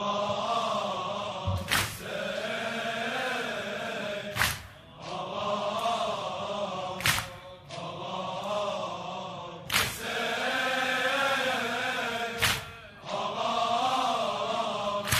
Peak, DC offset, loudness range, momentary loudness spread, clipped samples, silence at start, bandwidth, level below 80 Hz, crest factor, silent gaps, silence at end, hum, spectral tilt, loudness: -8 dBFS; under 0.1%; 4 LU; 11 LU; under 0.1%; 0 s; 15.5 kHz; -54 dBFS; 22 dB; none; 0 s; none; -3 dB/octave; -30 LUFS